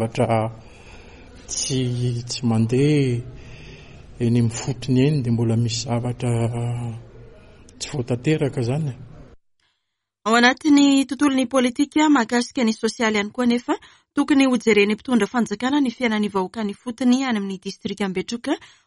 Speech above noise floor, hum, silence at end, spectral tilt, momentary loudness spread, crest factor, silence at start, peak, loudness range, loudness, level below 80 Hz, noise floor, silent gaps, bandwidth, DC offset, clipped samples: 59 dB; none; 0.2 s; -5.5 dB/octave; 12 LU; 18 dB; 0 s; -2 dBFS; 6 LU; -21 LUFS; -50 dBFS; -79 dBFS; none; 11.5 kHz; under 0.1%; under 0.1%